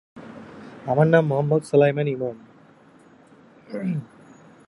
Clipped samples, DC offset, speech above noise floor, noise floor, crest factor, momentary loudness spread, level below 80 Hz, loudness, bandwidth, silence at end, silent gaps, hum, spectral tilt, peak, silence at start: under 0.1%; under 0.1%; 32 dB; -52 dBFS; 20 dB; 24 LU; -66 dBFS; -21 LUFS; 11.5 kHz; 0.65 s; none; none; -8 dB/octave; -4 dBFS; 0.15 s